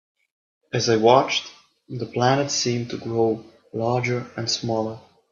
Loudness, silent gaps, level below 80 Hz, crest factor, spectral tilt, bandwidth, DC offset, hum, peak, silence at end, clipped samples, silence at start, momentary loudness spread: -22 LUFS; none; -64 dBFS; 22 dB; -4.5 dB/octave; 7.6 kHz; under 0.1%; none; 0 dBFS; 0.35 s; under 0.1%; 0.75 s; 16 LU